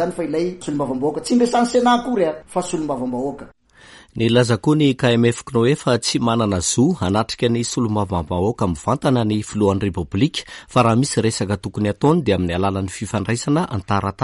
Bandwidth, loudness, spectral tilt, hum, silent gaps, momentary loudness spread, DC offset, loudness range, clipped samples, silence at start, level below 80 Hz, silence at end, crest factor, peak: 11.5 kHz; -19 LUFS; -5.5 dB/octave; none; none; 7 LU; under 0.1%; 2 LU; under 0.1%; 0 s; -46 dBFS; 0 s; 14 dB; -4 dBFS